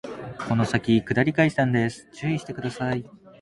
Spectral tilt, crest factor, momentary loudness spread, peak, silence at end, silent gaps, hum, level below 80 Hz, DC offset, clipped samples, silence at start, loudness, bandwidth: -7 dB/octave; 18 dB; 11 LU; -6 dBFS; 0.35 s; none; none; -54 dBFS; under 0.1%; under 0.1%; 0.05 s; -24 LUFS; 11.5 kHz